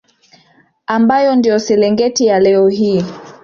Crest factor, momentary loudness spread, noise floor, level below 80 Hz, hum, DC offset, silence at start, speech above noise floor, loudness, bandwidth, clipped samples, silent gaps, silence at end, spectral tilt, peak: 10 dB; 8 LU; -52 dBFS; -54 dBFS; none; under 0.1%; 0.9 s; 40 dB; -12 LUFS; 7.4 kHz; under 0.1%; none; 0.1 s; -5 dB/octave; -2 dBFS